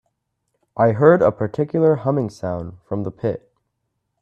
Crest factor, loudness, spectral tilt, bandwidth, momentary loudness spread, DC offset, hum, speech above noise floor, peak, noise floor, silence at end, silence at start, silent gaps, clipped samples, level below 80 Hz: 20 dB; -19 LUFS; -9.5 dB/octave; 8.4 kHz; 15 LU; under 0.1%; none; 56 dB; 0 dBFS; -75 dBFS; 0.85 s; 0.75 s; none; under 0.1%; -56 dBFS